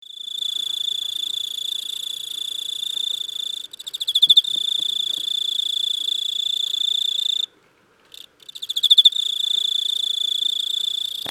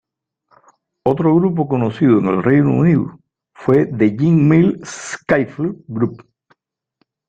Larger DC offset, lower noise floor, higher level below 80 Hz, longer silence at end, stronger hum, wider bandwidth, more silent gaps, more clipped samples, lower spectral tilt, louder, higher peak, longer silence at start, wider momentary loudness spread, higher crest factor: neither; second, -57 dBFS vs -67 dBFS; second, -76 dBFS vs -52 dBFS; second, 0 s vs 1.1 s; neither; first, 18 kHz vs 9 kHz; neither; neither; second, 2.5 dB/octave vs -8 dB/octave; second, -19 LUFS vs -16 LUFS; about the same, -2 dBFS vs -2 dBFS; second, 0.05 s vs 1.05 s; first, 14 LU vs 11 LU; first, 20 dB vs 14 dB